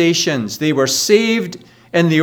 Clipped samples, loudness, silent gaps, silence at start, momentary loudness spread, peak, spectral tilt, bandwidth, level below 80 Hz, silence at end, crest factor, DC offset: under 0.1%; -15 LUFS; none; 0 s; 7 LU; 0 dBFS; -4 dB/octave; 20 kHz; -62 dBFS; 0 s; 16 dB; under 0.1%